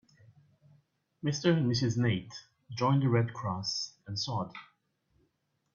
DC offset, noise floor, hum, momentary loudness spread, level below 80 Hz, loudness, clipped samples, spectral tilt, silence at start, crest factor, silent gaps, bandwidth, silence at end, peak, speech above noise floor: under 0.1%; -78 dBFS; none; 16 LU; -66 dBFS; -31 LUFS; under 0.1%; -5.5 dB/octave; 1.25 s; 20 dB; none; 7.4 kHz; 1.1 s; -12 dBFS; 48 dB